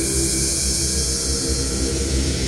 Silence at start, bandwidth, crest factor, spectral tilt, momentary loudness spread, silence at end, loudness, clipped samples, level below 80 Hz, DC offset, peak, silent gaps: 0 s; 16 kHz; 16 dB; -3 dB/octave; 3 LU; 0 s; -19 LUFS; under 0.1%; -26 dBFS; under 0.1%; -6 dBFS; none